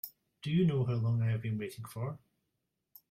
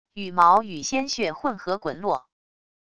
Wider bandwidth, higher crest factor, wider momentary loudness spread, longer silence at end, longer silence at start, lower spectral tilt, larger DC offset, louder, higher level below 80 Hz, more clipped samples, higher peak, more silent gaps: first, 16 kHz vs 11 kHz; second, 14 dB vs 20 dB; first, 14 LU vs 11 LU; first, 0.95 s vs 0.75 s; about the same, 0.05 s vs 0.15 s; first, -8 dB/octave vs -3.5 dB/octave; second, under 0.1% vs 0.4%; second, -34 LUFS vs -23 LUFS; second, -68 dBFS vs -62 dBFS; neither; second, -20 dBFS vs -4 dBFS; neither